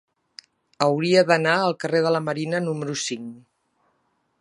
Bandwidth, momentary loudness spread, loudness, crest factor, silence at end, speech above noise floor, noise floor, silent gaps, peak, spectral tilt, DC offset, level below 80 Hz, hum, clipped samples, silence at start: 11.5 kHz; 10 LU; -22 LUFS; 22 dB; 1.05 s; 48 dB; -70 dBFS; none; -2 dBFS; -4.5 dB/octave; under 0.1%; -74 dBFS; none; under 0.1%; 0.8 s